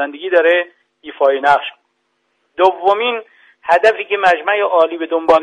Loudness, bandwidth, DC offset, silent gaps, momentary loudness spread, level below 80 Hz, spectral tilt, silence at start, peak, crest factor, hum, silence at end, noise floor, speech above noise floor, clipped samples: -14 LUFS; 9.6 kHz; under 0.1%; none; 16 LU; -58 dBFS; -3.5 dB/octave; 0 s; 0 dBFS; 14 dB; none; 0 s; -66 dBFS; 52 dB; under 0.1%